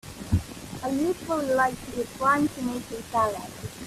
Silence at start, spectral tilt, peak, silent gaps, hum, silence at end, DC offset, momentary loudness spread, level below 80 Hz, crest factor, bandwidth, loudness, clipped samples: 0.05 s; -5.5 dB/octave; -12 dBFS; none; none; 0 s; under 0.1%; 11 LU; -46 dBFS; 16 dB; 15.5 kHz; -27 LUFS; under 0.1%